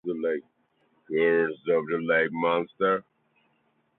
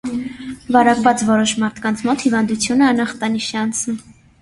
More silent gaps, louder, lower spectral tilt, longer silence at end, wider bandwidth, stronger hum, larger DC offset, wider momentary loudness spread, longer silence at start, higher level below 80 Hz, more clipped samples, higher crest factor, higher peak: neither; second, -26 LUFS vs -17 LUFS; first, -9.5 dB/octave vs -3.5 dB/octave; first, 0.95 s vs 0.3 s; second, 4.1 kHz vs 11.5 kHz; neither; neither; second, 7 LU vs 12 LU; about the same, 0.05 s vs 0.05 s; second, -72 dBFS vs -50 dBFS; neither; about the same, 16 dB vs 18 dB; second, -10 dBFS vs 0 dBFS